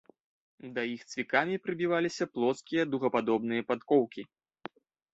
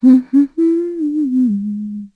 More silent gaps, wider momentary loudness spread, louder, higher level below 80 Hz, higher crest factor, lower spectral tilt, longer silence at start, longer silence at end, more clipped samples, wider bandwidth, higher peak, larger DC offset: neither; first, 20 LU vs 10 LU; second, -31 LUFS vs -16 LUFS; second, -74 dBFS vs -62 dBFS; first, 20 dB vs 12 dB; second, -5.5 dB/octave vs -10 dB/octave; first, 0.65 s vs 0 s; first, 0.9 s vs 0.1 s; neither; first, 8 kHz vs 4.2 kHz; second, -10 dBFS vs -2 dBFS; neither